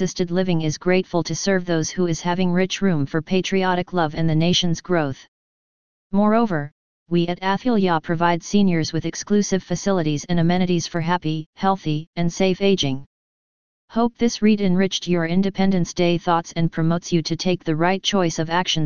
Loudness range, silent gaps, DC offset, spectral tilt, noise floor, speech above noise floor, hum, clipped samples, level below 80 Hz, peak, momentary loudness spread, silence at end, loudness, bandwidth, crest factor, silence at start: 2 LU; 5.28-6.10 s, 6.72-7.06 s, 11.46-11.53 s, 12.07-12.13 s, 13.06-13.88 s; 2%; -5.5 dB/octave; under -90 dBFS; over 70 dB; none; under 0.1%; -48 dBFS; -4 dBFS; 5 LU; 0 s; -21 LUFS; 7.2 kHz; 18 dB; 0 s